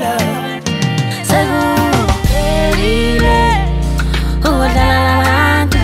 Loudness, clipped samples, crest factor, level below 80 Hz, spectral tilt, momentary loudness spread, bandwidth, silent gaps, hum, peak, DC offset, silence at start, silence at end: -13 LUFS; under 0.1%; 12 dB; -18 dBFS; -5 dB/octave; 5 LU; 16 kHz; none; none; -2 dBFS; under 0.1%; 0 s; 0 s